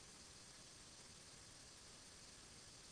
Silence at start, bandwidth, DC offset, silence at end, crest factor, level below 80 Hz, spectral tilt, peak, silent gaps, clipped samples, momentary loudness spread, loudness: 0 s; 11 kHz; under 0.1%; 0 s; 12 dB; -74 dBFS; -1.5 dB/octave; -50 dBFS; none; under 0.1%; 0 LU; -59 LUFS